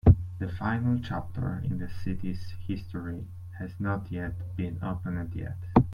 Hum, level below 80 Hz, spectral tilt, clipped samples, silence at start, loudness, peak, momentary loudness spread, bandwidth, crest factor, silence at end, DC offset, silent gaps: none; -40 dBFS; -9.5 dB/octave; under 0.1%; 0.05 s; -32 LUFS; -8 dBFS; 11 LU; 5.4 kHz; 22 dB; 0 s; under 0.1%; none